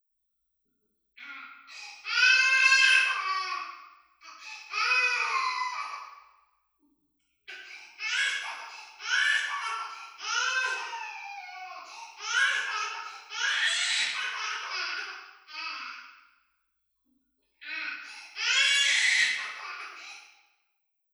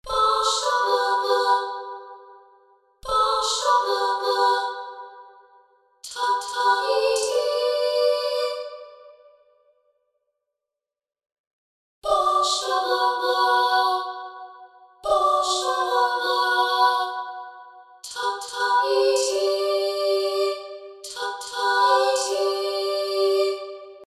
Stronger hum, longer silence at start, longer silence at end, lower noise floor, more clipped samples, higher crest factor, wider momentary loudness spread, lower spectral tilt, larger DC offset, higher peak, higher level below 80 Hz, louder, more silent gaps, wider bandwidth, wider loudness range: neither; first, 1.2 s vs 0.05 s; first, 0.85 s vs 0.05 s; second, -78 dBFS vs -88 dBFS; neither; first, 22 dB vs 16 dB; first, 22 LU vs 17 LU; second, 5 dB/octave vs 0 dB/octave; neither; about the same, -8 dBFS vs -8 dBFS; second, -90 dBFS vs -60 dBFS; second, -26 LUFS vs -22 LUFS; second, none vs 11.39-12.02 s; first, over 20 kHz vs 15 kHz; first, 11 LU vs 4 LU